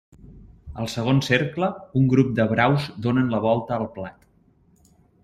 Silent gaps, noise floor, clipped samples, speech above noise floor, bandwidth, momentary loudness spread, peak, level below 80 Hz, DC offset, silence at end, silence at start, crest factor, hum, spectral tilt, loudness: none; -59 dBFS; under 0.1%; 38 dB; 13.5 kHz; 13 LU; -4 dBFS; -52 dBFS; under 0.1%; 1.15 s; 0.25 s; 20 dB; none; -7 dB/octave; -22 LUFS